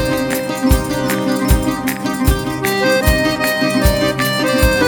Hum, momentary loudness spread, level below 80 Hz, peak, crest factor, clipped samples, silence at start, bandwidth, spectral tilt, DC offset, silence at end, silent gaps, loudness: none; 4 LU; -22 dBFS; 0 dBFS; 14 dB; under 0.1%; 0 s; over 20 kHz; -5 dB/octave; under 0.1%; 0 s; none; -16 LUFS